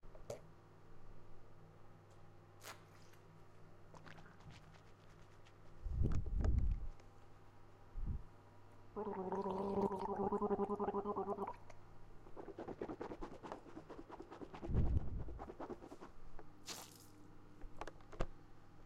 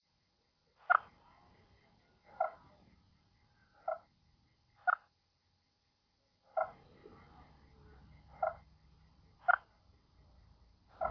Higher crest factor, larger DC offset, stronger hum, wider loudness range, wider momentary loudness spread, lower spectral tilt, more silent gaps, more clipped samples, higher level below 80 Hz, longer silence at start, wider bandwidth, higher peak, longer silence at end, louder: second, 22 dB vs 30 dB; neither; neither; first, 18 LU vs 7 LU; second, 24 LU vs 28 LU; first, -7 dB/octave vs -2 dB/octave; neither; neither; first, -50 dBFS vs -70 dBFS; second, 0.05 s vs 0.9 s; first, 15.5 kHz vs 5.4 kHz; second, -22 dBFS vs -12 dBFS; about the same, 0 s vs 0 s; second, -45 LUFS vs -37 LUFS